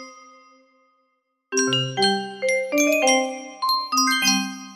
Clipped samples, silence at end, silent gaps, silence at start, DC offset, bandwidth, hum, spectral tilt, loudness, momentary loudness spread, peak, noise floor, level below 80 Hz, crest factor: under 0.1%; 0 s; none; 0 s; under 0.1%; 16 kHz; none; -2.5 dB/octave; -20 LUFS; 7 LU; -6 dBFS; -71 dBFS; -72 dBFS; 18 dB